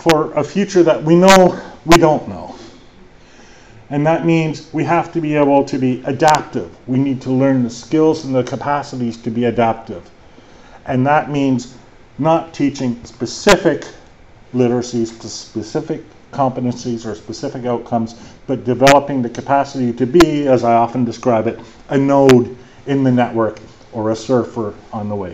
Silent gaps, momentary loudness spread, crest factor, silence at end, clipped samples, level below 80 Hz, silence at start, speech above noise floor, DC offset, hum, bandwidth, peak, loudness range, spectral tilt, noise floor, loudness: none; 15 LU; 16 dB; 0 s; under 0.1%; -42 dBFS; 0 s; 28 dB; 0.4%; none; 8.4 kHz; 0 dBFS; 6 LU; -6 dB/octave; -43 dBFS; -16 LUFS